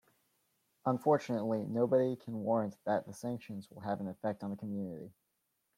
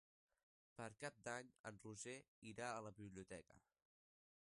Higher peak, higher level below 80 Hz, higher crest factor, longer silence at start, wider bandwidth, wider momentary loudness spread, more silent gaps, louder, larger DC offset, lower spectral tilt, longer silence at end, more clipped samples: first, -18 dBFS vs -34 dBFS; about the same, -80 dBFS vs -82 dBFS; about the same, 18 dB vs 22 dB; about the same, 0.85 s vs 0.75 s; first, 16 kHz vs 11.5 kHz; first, 13 LU vs 9 LU; second, none vs 1.60-1.64 s, 2.28-2.42 s; first, -35 LUFS vs -55 LUFS; neither; first, -8 dB/octave vs -4 dB/octave; second, 0.65 s vs 1 s; neither